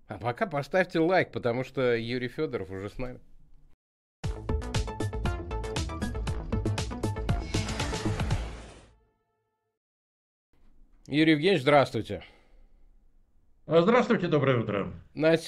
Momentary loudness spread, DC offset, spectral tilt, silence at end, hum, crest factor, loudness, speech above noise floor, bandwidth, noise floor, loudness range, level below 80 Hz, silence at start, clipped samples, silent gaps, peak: 15 LU; under 0.1%; -6 dB/octave; 0 s; none; 20 dB; -28 LUFS; 52 dB; 12.5 kHz; -78 dBFS; 9 LU; -42 dBFS; 0.1 s; under 0.1%; 3.74-4.23 s, 9.77-10.53 s; -10 dBFS